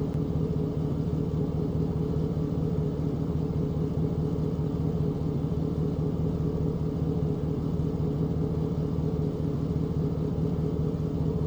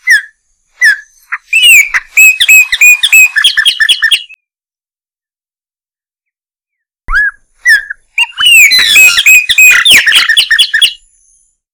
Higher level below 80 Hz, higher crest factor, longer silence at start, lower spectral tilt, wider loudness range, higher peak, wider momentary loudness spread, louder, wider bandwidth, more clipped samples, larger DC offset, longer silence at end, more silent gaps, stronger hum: about the same, -38 dBFS vs -36 dBFS; about the same, 12 dB vs 8 dB; about the same, 0 s vs 0.05 s; first, -10 dB/octave vs 3.5 dB/octave; second, 0 LU vs 12 LU; second, -14 dBFS vs 0 dBFS; second, 1 LU vs 11 LU; second, -29 LUFS vs -3 LUFS; second, 7.2 kHz vs over 20 kHz; second, under 0.1% vs 7%; neither; second, 0 s vs 0.8 s; neither; neither